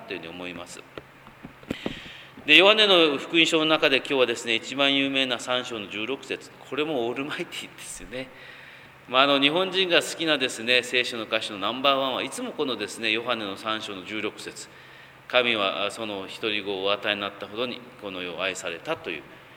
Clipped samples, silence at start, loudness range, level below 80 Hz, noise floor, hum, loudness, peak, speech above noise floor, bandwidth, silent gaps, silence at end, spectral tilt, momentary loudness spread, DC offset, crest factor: under 0.1%; 0 s; 9 LU; -62 dBFS; -47 dBFS; none; -23 LUFS; 0 dBFS; 22 dB; 19.5 kHz; none; 0 s; -3 dB/octave; 18 LU; under 0.1%; 26 dB